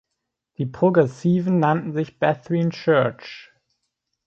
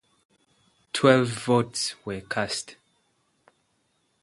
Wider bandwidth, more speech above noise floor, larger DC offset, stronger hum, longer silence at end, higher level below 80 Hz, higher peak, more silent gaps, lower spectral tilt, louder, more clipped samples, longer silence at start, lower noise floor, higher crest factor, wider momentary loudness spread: second, 7.4 kHz vs 11.5 kHz; first, 60 dB vs 47 dB; neither; neither; second, 0.85 s vs 1.5 s; about the same, -62 dBFS vs -62 dBFS; about the same, -4 dBFS vs -2 dBFS; neither; first, -8.5 dB/octave vs -4.5 dB/octave; first, -21 LUFS vs -25 LUFS; neither; second, 0.6 s vs 0.95 s; first, -80 dBFS vs -71 dBFS; second, 18 dB vs 26 dB; about the same, 12 LU vs 13 LU